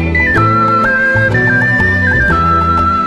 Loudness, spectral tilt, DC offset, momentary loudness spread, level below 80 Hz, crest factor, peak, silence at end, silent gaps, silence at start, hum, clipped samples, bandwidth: -10 LUFS; -7 dB/octave; under 0.1%; 1 LU; -26 dBFS; 10 dB; 0 dBFS; 0 s; none; 0 s; none; under 0.1%; 12 kHz